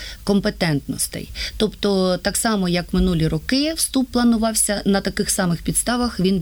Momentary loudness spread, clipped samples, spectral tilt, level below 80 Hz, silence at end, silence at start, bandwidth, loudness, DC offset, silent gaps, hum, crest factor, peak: 5 LU; under 0.1%; -4 dB/octave; -36 dBFS; 0 s; 0 s; over 20 kHz; -20 LUFS; under 0.1%; none; none; 14 dB; -6 dBFS